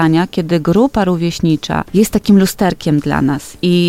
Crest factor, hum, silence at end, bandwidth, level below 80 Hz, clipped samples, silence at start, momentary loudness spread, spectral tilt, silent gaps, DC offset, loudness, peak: 12 dB; none; 0 s; 16.5 kHz; -36 dBFS; under 0.1%; 0 s; 5 LU; -6 dB/octave; none; under 0.1%; -14 LUFS; 0 dBFS